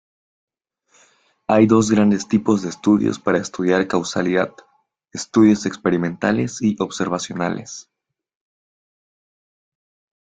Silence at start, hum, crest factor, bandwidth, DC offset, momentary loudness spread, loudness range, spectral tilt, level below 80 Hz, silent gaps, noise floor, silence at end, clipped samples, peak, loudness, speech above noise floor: 1.5 s; none; 18 dB; 9.2 kHz; under 0.1%; 12 LU; 10 LU; -5.5 dB/octave; -56 dBFS; none; -61 dBFS; 2.6 s; under 0.1%; -2 dBFS; -19 LUFS; 43 dB